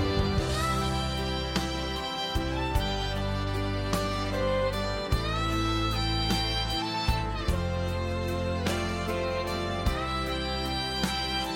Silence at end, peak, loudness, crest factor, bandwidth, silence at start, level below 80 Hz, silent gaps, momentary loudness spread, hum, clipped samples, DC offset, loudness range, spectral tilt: 0 s; -12 dBFS; -29 LUFS; 16 dB; 17 kHz; 0 s; -36 dBFS; none; 3 LU; none; under 0.1%; under 0.1%; 2 LU; -5 dB/octave